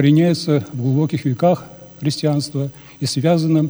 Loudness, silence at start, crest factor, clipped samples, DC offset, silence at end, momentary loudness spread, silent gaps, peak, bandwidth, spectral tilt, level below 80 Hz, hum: -19 LUFS; 0 s; 16 dB; under 0.1%; under 0.1%; 0 s; 10 LU; none; -2 dBFS; over 20 kHz; -7 dB/octave; -60 dBFS; none